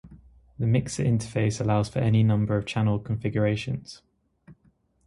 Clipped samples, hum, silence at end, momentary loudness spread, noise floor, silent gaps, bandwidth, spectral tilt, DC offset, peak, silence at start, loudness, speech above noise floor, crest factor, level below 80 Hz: under 0.1%; none; 0.55 s; 8 LU; -65 dBFS; none; 11.5 kHz; -7 dB/octave; under 0.1%; -10 dBFS; 0.05 s; -26 LUFS; 40 dB; 16 dB; -50 dBFS